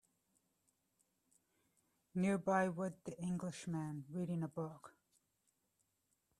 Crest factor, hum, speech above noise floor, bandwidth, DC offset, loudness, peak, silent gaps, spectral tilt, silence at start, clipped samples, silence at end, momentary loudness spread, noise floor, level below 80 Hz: 22 dB; none; 43 dB; 12.5 kHz; under 0.1%; -41 LUFS; -22 dBFS; none; -7 dB/octave; 2.15 s; under 0.1%; 1.5 s; 11 LU; -84 dBFS; -80 dBFS